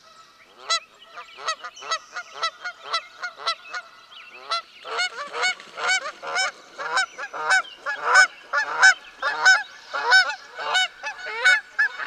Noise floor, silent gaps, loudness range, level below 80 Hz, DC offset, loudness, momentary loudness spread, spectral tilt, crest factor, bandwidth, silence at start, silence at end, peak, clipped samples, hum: -51 dBFS; none; 11 LU; -76 dBFS; under 0.1%; -22 LUFS; 16 LU; 2.5 dB/octave; 22 dB; 11.5 kHz; 0.6 s; 0 s; -2 dBFS; under 0.1%; none